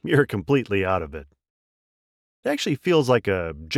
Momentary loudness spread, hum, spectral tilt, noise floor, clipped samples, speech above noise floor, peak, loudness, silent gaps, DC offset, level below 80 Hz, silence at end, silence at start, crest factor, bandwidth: 10 LU; none; -6 dB/octave; under -90 dBFS; under 0.1%; over 68 dB; -4 dBFS; -23 LUFS; 1.50-2.43 s; under 0.1%; -52 dBFS; 0 s; 0.05 s; 18 dB; 15.5 kHz